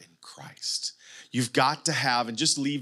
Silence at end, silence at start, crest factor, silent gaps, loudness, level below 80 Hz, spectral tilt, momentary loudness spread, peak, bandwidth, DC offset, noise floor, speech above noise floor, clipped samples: 0 s; 0 s; 20 dB; none; -26 LUFS; -82 dBFS; -2.5 dB/octave; 11 LU; -8 dBFS; 15 kHz; under 0.1%; -47 dBFS; 21 dB; under 0.1%